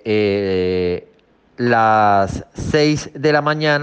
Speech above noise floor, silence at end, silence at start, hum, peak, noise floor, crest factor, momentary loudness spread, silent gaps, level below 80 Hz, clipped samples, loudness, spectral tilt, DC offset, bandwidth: 38 dB; 0 s; 0.05 s; none; -4 dBFS; -53 dBFS; 14 dB; 9 LU; none; -44 dBFS; under 0.1%; -17 LUFS; -5.5 dB/octave; under 0.1%; 9 kHz